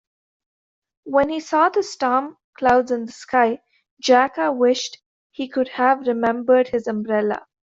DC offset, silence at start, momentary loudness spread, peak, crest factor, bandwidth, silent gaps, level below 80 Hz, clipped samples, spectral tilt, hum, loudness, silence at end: under 0.1%; 1.05 s; 9 LU; -4 dBFS; 18 dB; 7.8 kHz; 2.44-2.53 s, 3.91-3.97 s, 5.06-5.30 s; -58 dBFS; under 0.1%; -4 dB/octave; none; -20 LUFS; 0.3 s